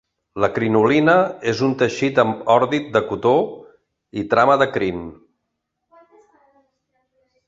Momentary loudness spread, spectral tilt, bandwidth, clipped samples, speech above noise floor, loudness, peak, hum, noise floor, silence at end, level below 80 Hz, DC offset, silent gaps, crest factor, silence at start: 14 LU; -6 dB/octave; 7.8 kHz; under 0.1%; 59 dB; -18 LUFS; -2 dBFS; none; -77 dBFS; 2.35 s; -54 dBFS; under 0.1%; none; 18 dB; 0.35 s